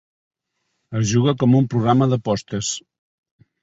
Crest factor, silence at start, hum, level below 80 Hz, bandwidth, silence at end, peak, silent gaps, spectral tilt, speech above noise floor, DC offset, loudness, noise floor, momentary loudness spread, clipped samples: 18 dB; 0.9 s; none; -52 dBFS; 8 kHz; 0.85 s; -4 dBFS; none; -6 dB/octave; 56 dB; under 0.1%; -19 LUFS; -74 dBFS; 9 LU; under 0.1%